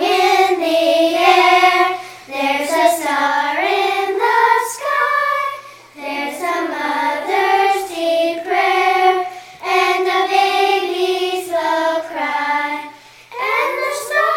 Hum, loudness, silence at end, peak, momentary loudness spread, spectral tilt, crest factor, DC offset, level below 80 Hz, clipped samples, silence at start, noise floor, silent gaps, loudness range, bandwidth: none; -16 LUFS; 0 s; 0 dBFS; 10 LU; -1.5 dB/octave; 16 dB; under 0.1%; -66 dBFS; under 0.1%; 0 s; -38 dBFS; none; 4 LU; 17 kHz